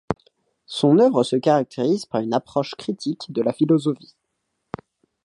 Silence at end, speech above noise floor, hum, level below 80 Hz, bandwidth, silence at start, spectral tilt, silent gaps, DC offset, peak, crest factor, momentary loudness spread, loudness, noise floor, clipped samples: 1.3 s; 56 dB; none; -60 dBFS; 11.5 kHz; 0.1 s; -6.5 dB/octave; none; under 0.1%; -2 dBFS; 18 dB; 17 LU; -21 LUFS; -76 dBFS; under 0.1%